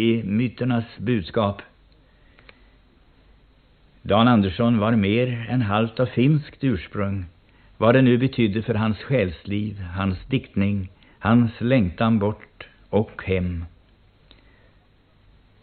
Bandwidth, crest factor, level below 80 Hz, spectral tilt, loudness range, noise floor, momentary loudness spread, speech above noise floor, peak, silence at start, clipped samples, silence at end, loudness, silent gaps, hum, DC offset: 4.5 kHz; 20 dB; -48 dBFS; -6.5 dB/octave; 7 LU; -57 dBFS; 11 LU; 36 dB; -4 dBFS; 0 s; under 0.1%; 1.95 s; -22 LUFS; none; none; under 0.1%